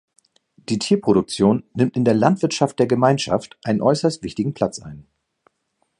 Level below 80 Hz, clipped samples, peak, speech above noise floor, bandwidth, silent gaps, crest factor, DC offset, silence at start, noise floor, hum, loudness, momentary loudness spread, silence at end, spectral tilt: -54 dBFS; under 0.1%; 0 dBFS; 52 dB; 11 kHz; none; 20 dB; under 0.1%; 0.7 s; -71 dBFS; none; -20 LUFS; 8 LU; 1 s; -6 dB/octave